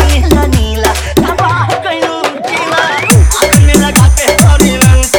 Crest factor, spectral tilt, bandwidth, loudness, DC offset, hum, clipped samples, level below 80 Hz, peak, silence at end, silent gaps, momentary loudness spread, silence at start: 8 dB; -4.5 dB/octave; over 20 kHz; -9 LUFS; under 0.1%; none; 2%; -14 dBFS; 0 dBFS; 0 s; none; 7 LU; 0 s